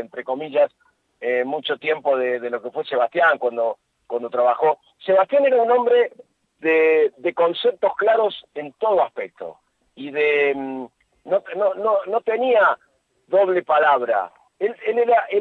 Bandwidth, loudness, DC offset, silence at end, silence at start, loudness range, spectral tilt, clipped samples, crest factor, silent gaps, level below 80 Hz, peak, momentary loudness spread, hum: 4.5 kHz; -20 LUFS; under 0.1%; 0 s; 0 s; 4 LU; -6 dB/octave; under 0.1%; 14 dB; none; -74 dBFS; -6 dBFS; 13 LU; none